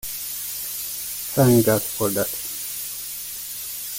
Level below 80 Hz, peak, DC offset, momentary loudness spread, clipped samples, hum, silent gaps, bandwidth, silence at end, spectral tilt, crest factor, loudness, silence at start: -54 dBFS; -6 dBFS; under 0.1%; 12 LU; under 0.1%; none; none; 17 kHz; 0 s; -4.5 dB/octave; 18 dB; -23 LUFS; 0.05 s